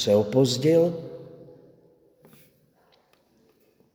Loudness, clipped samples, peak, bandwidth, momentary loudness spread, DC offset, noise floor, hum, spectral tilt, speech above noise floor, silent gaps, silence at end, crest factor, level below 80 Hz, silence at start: -22 LUFS; under 0.1%; -8 dBFS; over 20 kHz; 23 LU; under 0.1%; -63 dBFS; none; -6 dB/octave; 42 dB; none; 2.5 s; 18 dB; -68 dBFS; 0 s